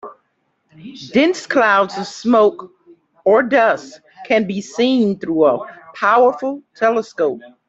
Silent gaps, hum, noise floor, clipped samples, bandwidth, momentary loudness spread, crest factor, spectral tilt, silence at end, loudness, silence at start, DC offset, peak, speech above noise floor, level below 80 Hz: none; none; -66 dBFS; under 0.1%; 8 kHz; 11 LU; 14 dB; -5 dB/octave; 0.2 s; -16 LUFS; 0.05 s; under 0.1%; -2 dBFS; 51 dB; -62 dBFS